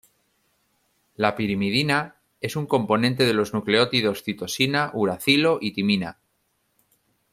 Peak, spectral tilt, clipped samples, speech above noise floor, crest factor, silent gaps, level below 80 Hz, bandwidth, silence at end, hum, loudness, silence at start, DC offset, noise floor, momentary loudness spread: -4 dBFS; -5 dB/octave; under 0.1%; 48 dB; 20 dB; none; -60 dBFS; 15.5 kHz; 1.2 s; none; -22 LUFS; 1.2 s; under 0.1%; -71 dBFS; 10 LU